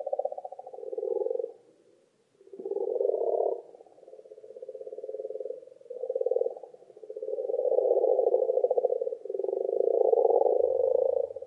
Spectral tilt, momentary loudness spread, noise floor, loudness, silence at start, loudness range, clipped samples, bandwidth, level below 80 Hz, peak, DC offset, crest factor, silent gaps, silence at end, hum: -8 dB/octave; 18 LU; -66 dBFS; -29 LUFS; 0 s; 10 LU; under 0.1%; 1.1 kHz; -86 dBFS; -10 dBFS; under 0.1%; 20 dB; none; 0 s; none